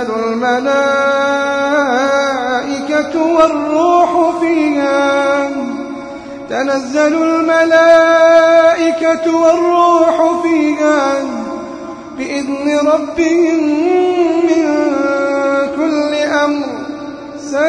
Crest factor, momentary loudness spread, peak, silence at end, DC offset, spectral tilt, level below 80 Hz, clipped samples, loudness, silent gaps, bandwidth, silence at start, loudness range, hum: 12 dB; 13 LU; 0 dBFS; 0 s; under 0.1%; -4 dB/octave; -52 dBFS; under 0.1%; -12 LUFS; none; 10.5 kHz; 0 s; 5 LU; none